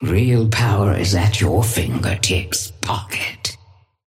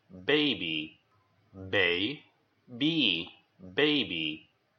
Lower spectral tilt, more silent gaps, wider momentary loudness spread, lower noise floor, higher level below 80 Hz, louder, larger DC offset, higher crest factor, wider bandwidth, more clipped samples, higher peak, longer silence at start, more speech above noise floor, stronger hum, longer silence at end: second, -4.5 dB/octave vs -6 dB/octave; neither; second, 7 LU vs 18 LU; second, -50 dBFS vs -69 dBFS; first, -36 dBFS vs -72 dBFS; first, -18 LUFS vs -28 LUFS; neither; second, 14 dB vs 20 dB; first, 16 kHz vs 6.6 kHz; neither; first, -4 dBFS vs -12 dBFS; second, 0 s vs 0.15 s; second, 32 dB vs 39 dB; neither; about the same, 0.5 s vs 0.4 s